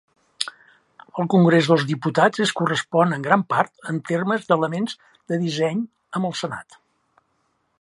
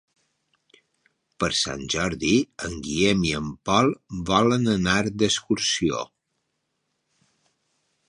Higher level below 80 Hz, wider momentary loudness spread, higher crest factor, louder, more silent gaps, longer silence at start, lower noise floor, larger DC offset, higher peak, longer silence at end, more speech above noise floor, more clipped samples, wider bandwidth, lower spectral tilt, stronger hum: second, -70 dBFS vs -48 dBFS; first, 12 LU vs 8 LU; about the same, 22 dB vs 20 dB; about the same, -21 LUFS vs -23 LUFS; neither; second, 0.4 s vs 1.4 s; second, -69 dBFS vs -76 dBFS; neither; first, 0 dBFS vs -4 dBFS; second, 1.2 s vs 2.05 s; second, 48 dB vs 53 dB; neither; about the same, 11.5 kHz vs 11 kHz; first, -6 dB/octave vs -4 dB/octave; neither